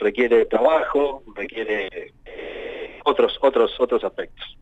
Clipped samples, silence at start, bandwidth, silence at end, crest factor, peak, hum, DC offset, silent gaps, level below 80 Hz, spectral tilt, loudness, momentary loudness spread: under 0.1%; 0 s; 7.8 kHz; 0.1 s; 16 dB; -6 dBFS; none; under 0.1%; none; -48 dBFS; -5.5 dB/octave; -21 LUFS; 16 LU